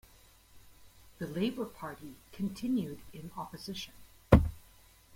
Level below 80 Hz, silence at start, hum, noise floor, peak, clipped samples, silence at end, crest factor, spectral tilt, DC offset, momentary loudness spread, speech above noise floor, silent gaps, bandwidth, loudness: -42 dBFS; 0.55 s; none; -60 dBFS; -4 dBFS; under 0.1%; 0.55 s; 30 dB; -7 dB/octave; under 0.1%; 21 LU; 23 dB; none; 16.5 kHz; -34 LUFS